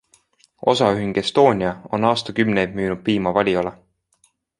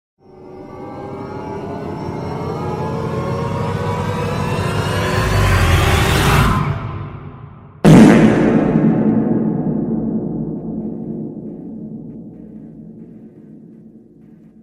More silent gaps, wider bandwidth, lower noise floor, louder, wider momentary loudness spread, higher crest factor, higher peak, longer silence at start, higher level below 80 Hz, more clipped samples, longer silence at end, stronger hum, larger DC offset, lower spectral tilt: neither; second, 11.5 kHz vs 16 kHz; first, -63 dBFS vs -43 dBFS; second, -20 LUFS vs -16 LUFS; second, 7 LU vs 22 LU; about the same, 18 dB vs 16 dB; about the same, -2 dBFS vs 0 dBFS; first, 0.6 s vs 0.35 s; second, -52 dBFS vs -30 dBFS; neither; first, 0.85 s vs 0.65 s; neither; neither; about the same, -6 dB/octave vs -6.5 dB/octave